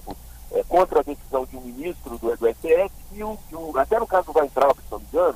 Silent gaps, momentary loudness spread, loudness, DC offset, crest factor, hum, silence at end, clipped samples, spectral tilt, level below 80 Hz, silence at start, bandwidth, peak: none; 14 LU; -23 LUFS; under 0.1%; 16 dB; none; 0 s; under 0.1%; -5.5 dB/octave; -42 dBFS; 0.05 s; 15.5 kHz; -6 dBFS